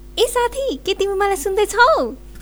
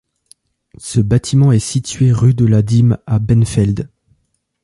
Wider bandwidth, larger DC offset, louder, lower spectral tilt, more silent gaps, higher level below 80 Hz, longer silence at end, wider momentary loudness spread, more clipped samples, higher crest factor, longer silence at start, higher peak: first, over 20 kHz vs 11.5 kHz; neither; second, -18 LUFS vs -14 LUFS; second, -2.5 dB/octave vs -7 dB/octave; neither; about the same, -38 dBFS vs -36 dBFS; second, 0 s vs 0.75 s; about the same, 8 LU vs 8 LU; neither; first, 18 dB vs 12 dB; second, 0 s vs 0.8 s; about the same, 0 dBFS vs -2 dBFS